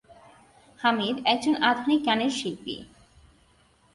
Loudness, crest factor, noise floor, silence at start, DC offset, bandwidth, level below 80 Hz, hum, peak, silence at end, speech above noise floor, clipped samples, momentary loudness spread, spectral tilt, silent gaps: -25 LUFS; 20 dB; -62 dBFS; 0.1 s; under 0.1%; 11.5 kHz; -64 dBFS; none; -8 dBFS; 1.1 s; 37 dB; under 0.1%; 13 LU; -3.5 dB/octave; none